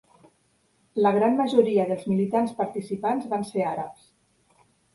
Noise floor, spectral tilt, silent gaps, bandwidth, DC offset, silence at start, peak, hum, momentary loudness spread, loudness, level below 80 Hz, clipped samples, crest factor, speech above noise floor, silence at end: -67 dBFS; -7.5 dB/octave; none; 11.5 kHz; under 0.1%; 0.95 s; -6 dBFS; none; 9 LU; -24 LUFS; -68 dBFS; under 0.1%; 20 dB; 43 dB; 1 s